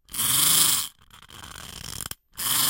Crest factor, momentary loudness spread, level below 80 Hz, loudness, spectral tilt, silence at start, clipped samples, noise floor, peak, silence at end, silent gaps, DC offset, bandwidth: 22 dB; 22 LU; -54 dBFS; -19 LUFS; 0.5 dB/octave; 0.1 s; under 0.1%; -49 dBFS; -4 dBFS; 0 s; none; under 0.1%; 17 kHz